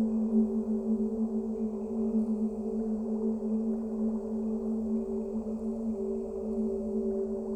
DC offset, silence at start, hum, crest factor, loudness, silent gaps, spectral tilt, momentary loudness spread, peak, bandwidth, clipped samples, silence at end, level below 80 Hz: under 0.1%; 0 s; none; 14 dB; -32 LUFS; none; -10.5 dB/octave; 5 LU; -16 dBFS; 8.2 kHz; under 0.1%; 0 s; -54 dBFS